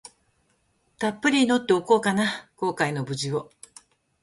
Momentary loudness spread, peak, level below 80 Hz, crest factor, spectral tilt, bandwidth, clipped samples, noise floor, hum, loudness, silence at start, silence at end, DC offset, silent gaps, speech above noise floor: 9 LU; -6 dBFS; -66 dBFS; 20 dB; -4.5 dB/octave; 11.5 kHz; under 0.1%; -68 dBFS; none; -24 LUFS; 1 s; 0.8 s; under 0.1%; none; 45 dB